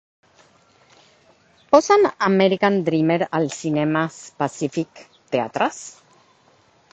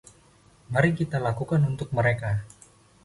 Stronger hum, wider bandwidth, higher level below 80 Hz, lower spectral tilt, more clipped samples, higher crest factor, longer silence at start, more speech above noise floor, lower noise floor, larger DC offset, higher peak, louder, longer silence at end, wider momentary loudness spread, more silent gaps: neither; second, 8.8 kHz vs 11.5 kHz; second, -64 dBFS vs -52 dBFS; second, -5.5 dB/octave vs -7.5 dB/octave; neither; about the same, 20 dB vs 20 dB; first, 1.7 s vs 0.7 s; first, 37 dB vs 33 dB; about the same, -57 dBFS vs -57 dBFS; neither; first, 0 dBFS vs -8 dBFS; first, -20 LUFS vs -26 LUFS; first, 1 s vs 0.55 s; first, 11 LU vs 7 LU; neither